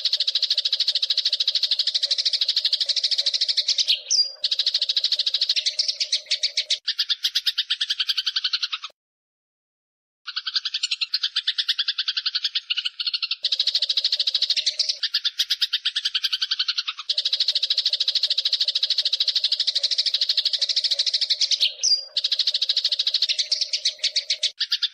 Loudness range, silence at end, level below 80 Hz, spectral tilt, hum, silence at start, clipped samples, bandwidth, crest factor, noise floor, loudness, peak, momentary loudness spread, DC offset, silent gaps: 5 LU; 0.05 s; -88 dBFS; 7 dB/octave; none; 0 s; under 0.1%; 15.5 kHz; 16 dB; under -90 dBFS; -21 LUFS; -8 dBFS; 4 LU; under 0.1%; 8.93-10.25 s